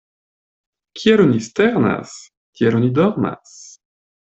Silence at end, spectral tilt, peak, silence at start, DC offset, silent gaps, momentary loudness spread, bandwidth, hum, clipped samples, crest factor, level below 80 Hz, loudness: 0.6 s; -6.5 dB/octave; -2 dBFS; 0.95 s; under 0.1%; 2.37-2.53 s; 22 LU; 8.2 kHz; none; under 0.1%; 16 dB; -56 dBFS; -17 LUFS